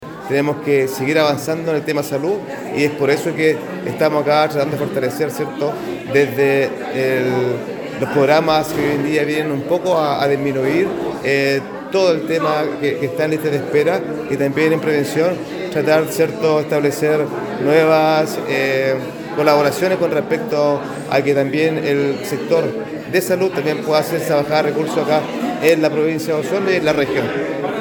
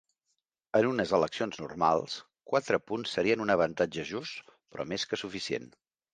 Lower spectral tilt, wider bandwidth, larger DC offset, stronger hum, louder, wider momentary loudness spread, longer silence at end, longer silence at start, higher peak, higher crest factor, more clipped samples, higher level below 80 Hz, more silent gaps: about the same, -5.5 dB/octave vs -4.5 dB/octave; first, 19.5 kHz vs 9.6 kHz; neither; neither; first, -17 LUFS vs -31 LUFS; second, 7 LU vs 12 LU; second, 0 s vs 0.45 s; second, 0 s vs 0.75 s; first, 0 dBFS vs -10 dBFS; about the same, 16 dB vs 20 dB; neither; first, -56 dBFS vs -64 dBFS; neither